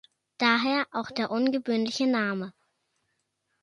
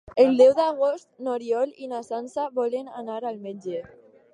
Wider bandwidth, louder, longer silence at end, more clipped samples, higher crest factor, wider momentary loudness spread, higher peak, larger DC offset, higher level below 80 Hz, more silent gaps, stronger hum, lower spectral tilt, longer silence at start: first, 11.5 kHz vs 9.8 kHz; second, -27 LUFS vs -24 LUFS; first, 1.15 s vs 0.5 s; neither; about the same, 20 dB vs 18 dB; second, 8 LU vs 17 LU; about the same, -8 dBFS vs -6 dBFS; neither; second, -76 dBFS vs -66 dBFS; neither; neither; about the same, -4.5 dB/octave vs -5.5 dB/octave; first, 0.4 s vs 0.15 s